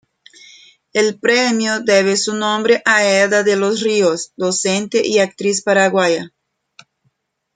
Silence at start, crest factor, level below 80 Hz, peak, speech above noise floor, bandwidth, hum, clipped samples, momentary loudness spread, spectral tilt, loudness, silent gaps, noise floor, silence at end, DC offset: 0.95 s; 14 dB; -66 dBFS; -2 dBFS; 51 dB; 9.6 kHz; none; under 0.1%; 5 LU; -3 dB/octave; -15 LUFS; none; -66 dBFS; 1.3 s; under 0.1%